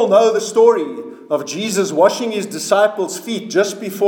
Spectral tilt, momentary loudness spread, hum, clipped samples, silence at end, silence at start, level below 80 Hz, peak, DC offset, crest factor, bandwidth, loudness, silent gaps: -3.5 dB/octave; 10 LU; none; under 0.1%; 0 s; 0 s; -74 dBFS; 0 dBFS; under 0.1%; 16 dB; 19 kHz; -16 LUFS; none